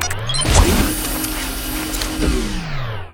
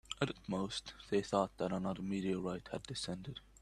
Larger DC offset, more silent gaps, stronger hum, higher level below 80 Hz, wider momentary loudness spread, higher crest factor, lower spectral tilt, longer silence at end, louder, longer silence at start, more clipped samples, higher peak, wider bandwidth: neither; neither; neither; first, -22 dBFS vs -62 dBFS; about the same, 11 LU vs 9 LU; second, 18 dB vs 24 dB; second, -3.5 dB/octave vs -5.5 dB/octave; second, 0 s vs 0.2 s; first, -19 LUFS vs -39 LUFS; about the same, 0 s vs 0.1 s; neither; first, 0 dBFS vs -16 dBFS; first, 19 kHz vs 12 kHz